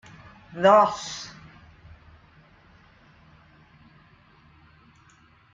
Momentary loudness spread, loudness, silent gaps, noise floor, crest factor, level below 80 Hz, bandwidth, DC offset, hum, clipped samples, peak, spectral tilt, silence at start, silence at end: 30 LU; -21 LUFS; none; -57 dBFS; 24 dB; -62 dBFS; 7.8 kHz; under 0.1%; none; under 0.1%; -4 dBFS; -4.5 dB/octave; 0.55 s; 4.25 s